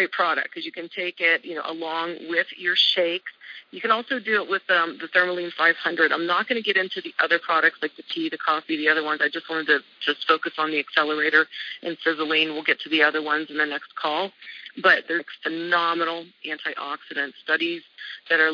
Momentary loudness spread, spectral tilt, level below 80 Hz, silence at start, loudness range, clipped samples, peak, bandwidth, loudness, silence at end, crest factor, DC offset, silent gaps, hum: 12 LU; -4 dB/octave; under -90 dBFS; 0 s; 2 LU; under 0.1%; -4 dBFS; 5.4 kHz; -23 LUFS; 0 s; 20 dB; under 0.1%; none; none